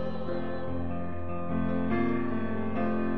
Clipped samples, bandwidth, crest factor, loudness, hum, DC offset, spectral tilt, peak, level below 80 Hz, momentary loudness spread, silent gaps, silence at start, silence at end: under 0.1%; 4.9 kHz; 14 dB; -32 LUFS; none; 3%; -7.5 dB/octave; -16 dBFS; -50 dBFS; 7 LU; none; 0 s; 0 s